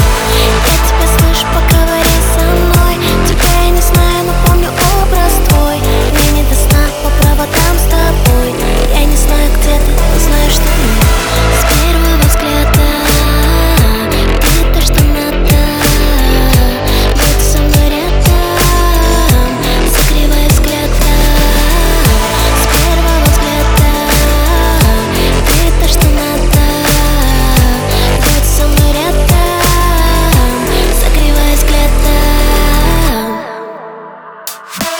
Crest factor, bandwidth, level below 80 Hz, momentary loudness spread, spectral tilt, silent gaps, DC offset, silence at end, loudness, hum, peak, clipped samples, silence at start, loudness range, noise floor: 8 dB; over 20 kHz; -10 dBFS; 2 LU; -4.5 dB/octave; none; under 0.1%; 0 s; -10 LUFS; none; 0 dBFS; under 0.1%; 0 s; 1 LU; -29 dBFS